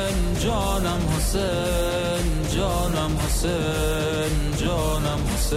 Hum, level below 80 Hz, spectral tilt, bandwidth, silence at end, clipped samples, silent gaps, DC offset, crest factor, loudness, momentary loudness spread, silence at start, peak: none; -28 dBFS; -5 dB/octave; 16 kHz; 0 s; under 0.1%; none; under 0.1%; 10 dB; -24 LUFS; 1 LU; 0 s; -12 dBFS